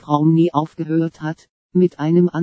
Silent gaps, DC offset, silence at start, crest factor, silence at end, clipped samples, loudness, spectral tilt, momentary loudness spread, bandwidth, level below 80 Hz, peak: 1.50-1.69 s; under 0.1%; 0.05 s; 16 dB; 0 s; under 0.1%; -18 LUFS; -9.5 dB/octave; 14 LU; 7.4 kHz; -64 dBFS; 0 dBFS